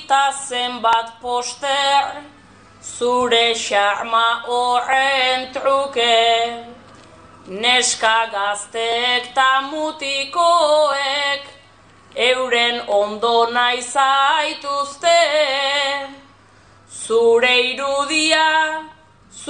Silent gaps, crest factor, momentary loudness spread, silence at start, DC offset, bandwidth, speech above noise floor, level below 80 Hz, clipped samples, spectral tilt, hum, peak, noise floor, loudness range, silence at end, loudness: none; 16 dB; 9 LU; 0 s; under 0.1%; 10 kHz; 31 dB; -62 dBFS; under 0.1%; -0.5 dB/octave; none; -2 dBFS; -49 dBFS; 2 LU; 0 s; -17 LUFS